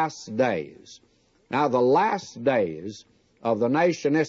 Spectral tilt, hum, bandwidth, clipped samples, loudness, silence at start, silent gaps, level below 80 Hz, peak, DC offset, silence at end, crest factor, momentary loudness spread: -6 dB/octave; none; 7.8 kHz; under 0.1%; -24 LUFS; 0 s; none; -70 dBFS; -10 dBFS; under 0.1%; 0 s; 14 dB; 16 LU